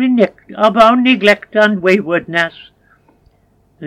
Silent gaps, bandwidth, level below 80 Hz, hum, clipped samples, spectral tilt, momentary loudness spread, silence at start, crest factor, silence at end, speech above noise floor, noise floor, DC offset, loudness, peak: none; 12 kHz; -54 dBFS; none; 0.2%; -5.5 dB/octave; 8 LU; 0 s; 14 dB; 0 s; 42 dB; -54 dBFS; under 0.1%; -12 LUFS; 0 dBFS